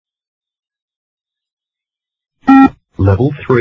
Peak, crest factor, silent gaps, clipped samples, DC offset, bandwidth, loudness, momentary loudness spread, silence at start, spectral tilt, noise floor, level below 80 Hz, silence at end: 0 dBFS; 14 dB; none; 0.2%; under 0.1%; 5.8 kHz; -11 LUFS; 8 LU; 2.45 s; -9.5 dB/octave; -87 dBFS; -34 dBFS; 0 s